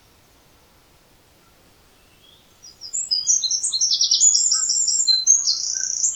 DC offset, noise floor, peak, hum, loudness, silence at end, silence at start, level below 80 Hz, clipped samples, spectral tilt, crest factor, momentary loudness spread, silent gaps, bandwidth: under 0.1%; -55 dBFS; -2 dBFS; none; -16 LUFS; 0 s; 2.65 s; -62 dBFS; under 0.1%; 4.5 dB/octave; 20 dB; 8 LU; none; over 20 kHz